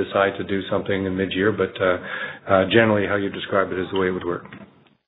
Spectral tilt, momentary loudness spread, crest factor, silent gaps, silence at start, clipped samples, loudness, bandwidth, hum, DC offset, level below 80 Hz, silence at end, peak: -9.5 dB/octave; 11 LU; 20 dB; none; 0 s; under 0.1%; -22 LUFS; 4.1 kHz; none; under 0.1%; -58 dBFS; 0.4 s; -2 dBFS